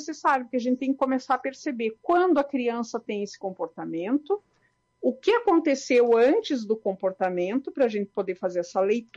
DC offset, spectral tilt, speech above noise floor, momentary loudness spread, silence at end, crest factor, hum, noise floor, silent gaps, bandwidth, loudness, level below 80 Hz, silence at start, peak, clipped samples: under 0.1%; -5 dB/octave; 44 dB; 10 LU; 0.15 s; 14 dB; none; -69 dBFS; none; 7.8 kHz; -25 LUFS; -70 dBFS; 0 s; -12 dBFS; under 0.1%